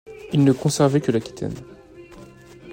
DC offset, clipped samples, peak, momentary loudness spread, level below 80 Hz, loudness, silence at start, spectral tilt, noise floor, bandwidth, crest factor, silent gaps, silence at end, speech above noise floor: under 0.1%; under 0.1%; -4 dBFS; 13 LU; -54 dBFS; -21 LUFS; 0.1 s; -6.5 dB/octave; -44 dBFS; 16.5 kHz; 18 dB; none; 0 s; 24 dB